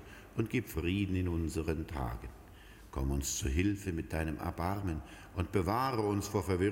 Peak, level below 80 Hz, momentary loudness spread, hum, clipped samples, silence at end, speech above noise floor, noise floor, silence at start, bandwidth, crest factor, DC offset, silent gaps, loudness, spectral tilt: -18 dBFS; -44 dBFS; 11 LU; none; under 0.1%; 0 s; 20 dB; -54 dBFS; 0 s; 16.5 kHz; 18 dB; under 0.1%; none; -35 LUFS; -5.5 dB/octave